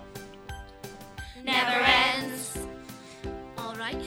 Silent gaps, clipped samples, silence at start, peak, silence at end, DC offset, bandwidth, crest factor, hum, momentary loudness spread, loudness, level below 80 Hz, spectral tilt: none; under 0.1%; 0 s; -4 dBFS; 0 s; under 0.1%; 19.5 kHz; 26 dB; none; 23 LU; -25 LUFS; -48 dBFS; -2.5 dB/octave